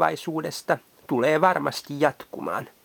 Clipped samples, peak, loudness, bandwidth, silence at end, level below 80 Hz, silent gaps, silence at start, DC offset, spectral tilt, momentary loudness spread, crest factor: under 0.1%; -4 dBFS; -25 LUFS; 19.5 kHz; 0.15 s; -68 dBFS; none; 0 s; under 0.1%; -5 dB/octave; 11 LU; 20 dB